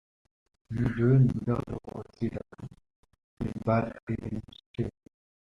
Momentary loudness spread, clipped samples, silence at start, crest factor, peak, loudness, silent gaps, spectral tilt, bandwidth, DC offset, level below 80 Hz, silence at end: 18 LU; under 0.1%; 0.7 s; 18 dB; -12 dBFS; -30 LUFS; 2.96-3.03 s, 3.24-3.37 s, 4.03-4.07 s, 4.66-4.74 s; -10 dB/octave; 5.8 kHz; under 0.1%; -52 dBFS; 0.65 s